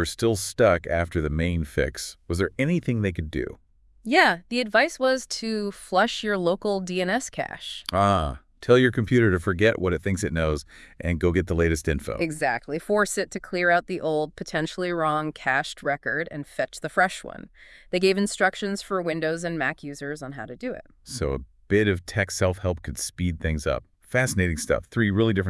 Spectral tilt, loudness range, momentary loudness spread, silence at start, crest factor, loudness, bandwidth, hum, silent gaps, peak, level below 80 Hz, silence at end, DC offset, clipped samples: -5 dB/octave; 4 LU; 11 LU; 0 s; 20 dB; -25 LUFS; 12 kHz; none; none; -4 dBFS; -44 dBFS; 0 s; under 0.1%; under 0.1%